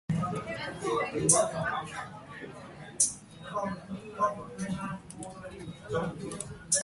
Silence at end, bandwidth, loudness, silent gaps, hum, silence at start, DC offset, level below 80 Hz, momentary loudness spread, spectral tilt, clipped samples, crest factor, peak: 0 s; 12 kHz; -31 LUFS; none; none; 0.1 s; under 0.1%; -58 dBFS; 19 LU; -3.5 dB/octave; under 0.1%; 26 dB; -8 dBFS